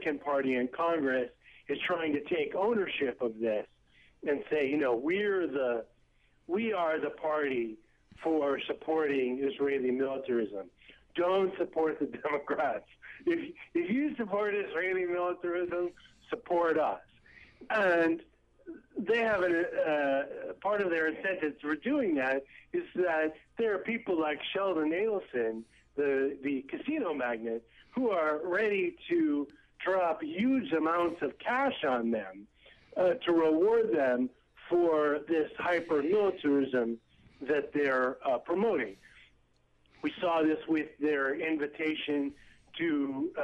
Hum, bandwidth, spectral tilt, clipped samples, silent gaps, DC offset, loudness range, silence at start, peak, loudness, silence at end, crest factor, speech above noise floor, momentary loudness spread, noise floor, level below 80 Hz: none; 8 kHz; -6.5 dB/octave; under 0.1%; none; under 0.1%; 3 LU; 0 s; -20 dBFS; -31 LUFS; 0 s; 12 dB; 37 dB; 9 LU; -68 dBFS; -68 dBFS